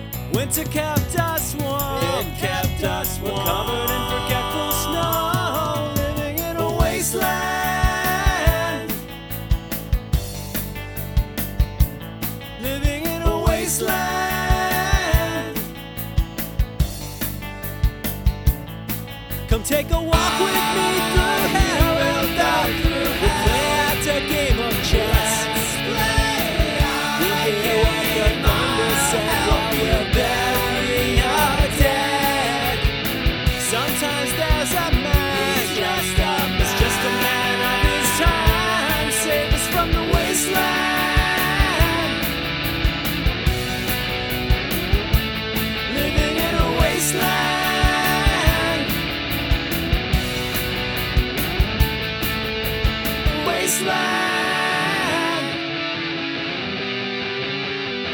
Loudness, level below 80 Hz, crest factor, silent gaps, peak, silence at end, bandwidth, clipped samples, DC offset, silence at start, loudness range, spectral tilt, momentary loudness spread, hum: -20 LUFS; -26 dBFS; 20 dB; none; 0 dBFS; 0 s; over 20 kHz; under 0.1%; under 0.1%; 0 s; 5 LU; -4 dB/octave; 7 LU; none